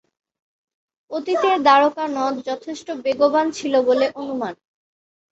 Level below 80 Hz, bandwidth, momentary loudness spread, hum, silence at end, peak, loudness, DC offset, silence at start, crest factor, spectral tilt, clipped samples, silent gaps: -66 dBFS; 8.2 kHz; 14 LU; none; 0.75 s; -2 dBFS; -19 LUFS; under 0.1%; 1.1 s; 18 dB; -3.5 dB/octave; under 0.1%; none